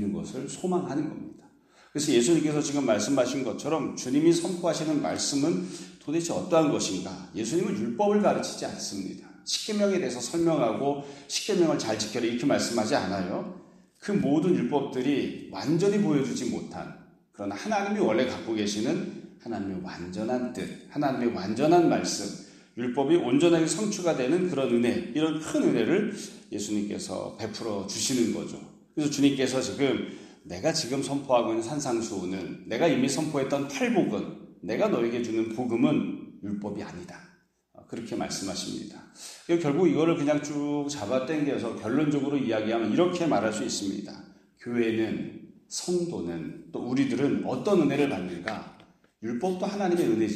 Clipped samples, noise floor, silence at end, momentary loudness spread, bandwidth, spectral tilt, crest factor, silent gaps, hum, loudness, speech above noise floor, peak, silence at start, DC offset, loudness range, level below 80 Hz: under 0.1%; -62 dBFS; 0 s; 14 LU; 14 kHz; -5 dB/octave; 18 dB; none; none; -27 LUFS; 35 dB; -8 dBFS; 0 s; under 0.1%; 4 LU; -66 dBFS